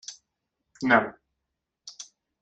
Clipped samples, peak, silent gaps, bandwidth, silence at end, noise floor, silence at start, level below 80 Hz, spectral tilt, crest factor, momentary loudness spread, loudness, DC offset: under 0.1%; -6 dBFS; none; 9.4 kHz; 0.4 s; -83 dBFS; 0.1 s; -68 dBFS; -4 dB/octave; 26 dB; 24 LU; -24 LUFS; under 0.1%